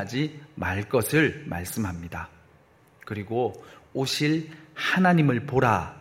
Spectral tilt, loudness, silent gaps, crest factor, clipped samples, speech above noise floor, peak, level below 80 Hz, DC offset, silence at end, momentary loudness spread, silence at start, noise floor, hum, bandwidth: -5.5 dB/octave; -25 LUFS; none; 20 dB; under 0.1%; 32 dB; -6 dBFS; -54 dBFS; under 0.1%; 0 s; 16 LU; 0 s; -57 dBFS; none; 16.5 kHz